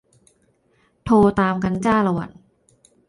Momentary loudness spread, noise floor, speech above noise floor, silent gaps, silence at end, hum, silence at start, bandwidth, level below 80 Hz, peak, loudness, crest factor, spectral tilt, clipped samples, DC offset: 16 LU; -62 dBFS; 45 dB; none; 0.8 s; none; 1.05 s; 11 kHz; -48 dBFS; -4 dBFS; -19 LUFS; 16 dB; -7.5 dB/octave; under 0.1%; under 0.1%